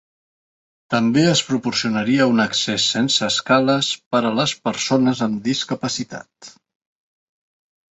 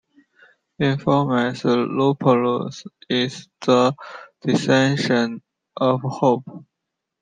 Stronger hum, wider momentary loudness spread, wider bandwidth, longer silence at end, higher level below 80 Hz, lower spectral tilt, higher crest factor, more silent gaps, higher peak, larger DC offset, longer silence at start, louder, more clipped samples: neither; second, 7 LU vs 15 LU; second, 8.2 kHz vs 9.6 kHz; first, 1.4 s vs 0.6 s; about the same, -60 dBFS vs -62 dBFS; second, -4 dB/octave vs -6 dB/octave; about the same, 18 dB vs 18 dB; first, 4.06-4.11 s vs none; about the same, -2 dBFS vs -4 dBFS; neither; about the same, 0.9 s vs 0.8 s; about the same, -18 LUFS vs -20 LUFS; neither